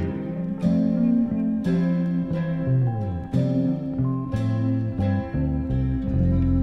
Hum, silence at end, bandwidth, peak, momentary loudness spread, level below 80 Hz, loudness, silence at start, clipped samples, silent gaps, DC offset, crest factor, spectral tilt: none; 0 s; 6 kHz; -10 dBFS; 4 LU; -36 dBFS; -24 LUFS; 0 s; under 0.1%; none; under 0.1%; 12 dB; -10.5 dB/octave